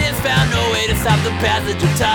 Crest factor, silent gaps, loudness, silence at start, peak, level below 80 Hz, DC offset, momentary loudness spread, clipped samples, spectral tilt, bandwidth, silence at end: 14 dB; none; -16 LUFS; 0 s; -2 dBFS; -30 dBFS; under 0.1%; 2 LU; under 0.1%; -4.5 dB/octave; over 20 kHz; 0 s